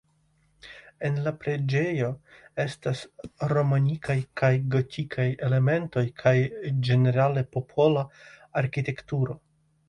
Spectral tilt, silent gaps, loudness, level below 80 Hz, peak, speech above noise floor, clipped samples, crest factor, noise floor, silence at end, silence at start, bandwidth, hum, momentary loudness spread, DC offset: -8 dB/octave; none; -26 LUFS; -60 dBFS; -8 dBFS; 41 dB; under 0.1%; 18 dB; -66 dBFS; 0.5 s; 0.65 s; 10 kHz; none; 10 LU; under 0.1%